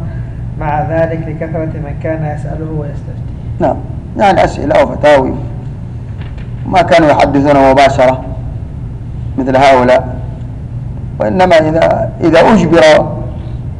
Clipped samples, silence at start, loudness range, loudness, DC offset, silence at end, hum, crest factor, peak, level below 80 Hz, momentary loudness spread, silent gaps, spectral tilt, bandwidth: under 0.1%; 0 s; 7 LU; -10 LUFS; under 0.1%; 0 s; none; 10 dB; -2 dBFS; -26 dBFS; 16 LU; none; -6.5 dB/octave; 10.5 kHz